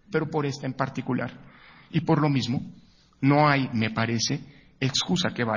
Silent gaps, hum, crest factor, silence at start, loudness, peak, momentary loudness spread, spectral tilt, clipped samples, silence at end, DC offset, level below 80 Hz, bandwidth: none; none; 20 dB; 0.1 s; -25 LUFS; -6 dBFS; 10 LU; -5 dB/octave; under 0.1%; 0 s; under 0.1%; -58 dBFS; 7.4 kHz